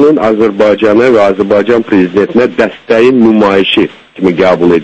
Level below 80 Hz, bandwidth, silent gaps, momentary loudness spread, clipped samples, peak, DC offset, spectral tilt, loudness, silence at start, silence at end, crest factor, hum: -42 dBFS; 8.6 kHz; none; 5 LU; 1%; 0 dBFS; under 0.1%; -6.5 dB/octave; -8 LUFS; 0 s; 0 s; 8 dB; none